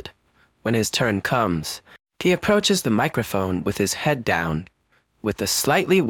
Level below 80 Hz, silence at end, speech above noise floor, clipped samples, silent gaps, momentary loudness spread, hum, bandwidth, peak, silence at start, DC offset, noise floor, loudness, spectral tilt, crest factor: -50 dBFS; 0 s; 40 dB; under 0.1%; none; 11 LU; none; 19 kHz; -6 dBFS; 0.05 s; under 0.1%; -61 dBFS; -22 LUFS; -4 dB/octave; 16 dB